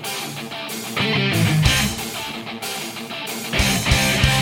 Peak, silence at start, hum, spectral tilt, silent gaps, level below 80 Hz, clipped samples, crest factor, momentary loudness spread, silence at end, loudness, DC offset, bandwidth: -4 dBFS; 0 s; none; -3.5 dB/octave; none; -32 dBFS; under 0.1%; 18 dB; 12 LU; 0 s; -20 LUFS; under 0.1%; 17 kHz